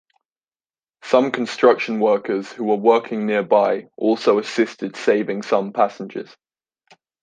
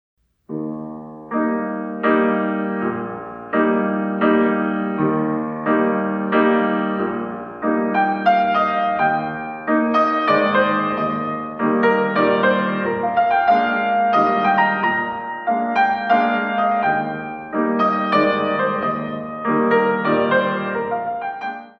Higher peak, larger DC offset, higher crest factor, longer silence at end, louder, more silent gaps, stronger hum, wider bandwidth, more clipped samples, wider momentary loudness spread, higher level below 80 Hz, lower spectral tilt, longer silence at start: about the same, -2 dBFS vs -4 dBFS; neither; about the same, 18 dB vs 16 dB; first, 1 s vs 0.1 s; about the same, -19 LUFS vs -19 LUFS; neither; neither; first, 9.2 kHz vs 6.2 kHz; neither; about the same, 8 LU vs 10 LU; second, -72 dBFS vs -60 dBFS; second, -5.5 dB/octave vs -8 dB/octave; first, 1.05 s vs 0.5 s